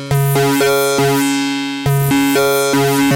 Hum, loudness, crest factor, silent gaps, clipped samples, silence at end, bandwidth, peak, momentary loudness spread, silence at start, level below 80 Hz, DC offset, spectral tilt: none; -14 LUFS; 12 dB; none; under 0.1%; 0 s; 17 kHz; -2 dBFS; 4 LU; 0 s; -44 dBFS; under 0.1%; -5 dB/octave